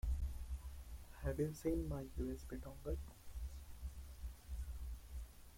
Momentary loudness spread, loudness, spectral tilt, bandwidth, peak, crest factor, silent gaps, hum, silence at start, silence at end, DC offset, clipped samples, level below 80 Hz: 13 LU; -48 LUFS; -7 dB/octave; 16.5 kHz; -28 dBFS; 16 dB; none; none; 0.05 s; 0 s; under 0.1%; under 0.1%; -48 dBFS